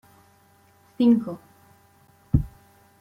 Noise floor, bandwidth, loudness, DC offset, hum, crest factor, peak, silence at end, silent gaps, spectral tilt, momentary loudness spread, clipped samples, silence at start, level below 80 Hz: -58 dBFS; 5.4 kHz; -23 LUFS; under 0.1%; none; 22 dB; -6 dBFS; 0.55 s; none; -9.5 dB/octave; 19 LU; under 0.1%; 1 s; -40 dBFS